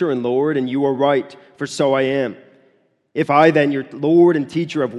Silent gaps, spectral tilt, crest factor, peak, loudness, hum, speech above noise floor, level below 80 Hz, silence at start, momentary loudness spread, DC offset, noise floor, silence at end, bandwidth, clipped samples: none; -6.5 dB/octave; 18 dB; 0 dBFS; -17 LUFS; none; 43 dB; -66 dBFS; 0 s; 13 LU; under 0.1%; -59 dBFS; 0 s; 11 kHz; under 0.1%